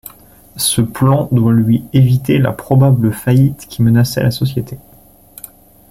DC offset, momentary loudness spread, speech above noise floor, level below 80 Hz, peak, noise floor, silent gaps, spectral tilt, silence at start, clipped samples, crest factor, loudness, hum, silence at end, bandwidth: under 0.1%; 13 LU; 32 dB; -42 dBFS; 0 dBFS; -44 dBFS; none; -6.5 dB/octave; 0.55 s; under 0.1%; 12 dB; -13 LUFS; none; 1.15 s; 16 kHz